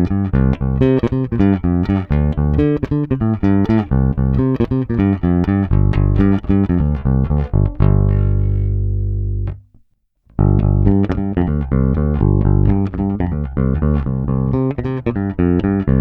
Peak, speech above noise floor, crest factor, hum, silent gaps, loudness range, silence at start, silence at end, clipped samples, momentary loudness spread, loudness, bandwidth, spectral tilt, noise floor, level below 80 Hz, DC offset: 0 dBFS; 42 dB; 14 dB; 50 Hz at -30 dBFS; none; 2 LU; 0 s; 0 s; under 0.1%; 5 LU; -17 LUFS; 4.7 kHz; -11.5 dB/octave; -56 dBFS; -22 dBFS; under 0.1%